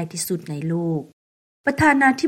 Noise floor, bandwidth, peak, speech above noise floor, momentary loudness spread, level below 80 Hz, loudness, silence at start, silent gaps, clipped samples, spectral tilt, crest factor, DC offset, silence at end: under -90 dBFS; 16 kHz; -4 dBFS; over 70 dB; 11 LU; -52 dBFS; -21 LUFS; 0 s; 1.13-1.64 s; under 0.1%; -5 dB/octave; 18 dB; under 0.1%; 0 s